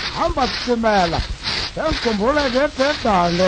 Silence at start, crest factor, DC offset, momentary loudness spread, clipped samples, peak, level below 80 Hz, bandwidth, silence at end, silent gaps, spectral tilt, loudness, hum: 0 s; 14 dB; under 0.1%; 5 LU; under 0.1%; -4 dBFS; -32 dBFS; 9.6 kHz; 0 s; none; -4.5 dB/octave; -19 LUFS; none